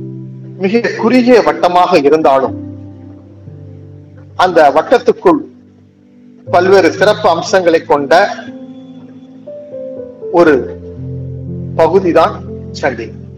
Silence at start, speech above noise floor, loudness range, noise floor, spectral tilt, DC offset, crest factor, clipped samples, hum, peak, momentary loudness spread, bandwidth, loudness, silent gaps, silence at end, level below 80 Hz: 0 s; 33 dB; 4 LU; -43 dBFS; -6 dB/octave; under 0.1%; 12 dB; 1%; none; 0 dBFS; 21 LU; 12 kHz; -10 LUFS; none; 0 s; -46 dBFS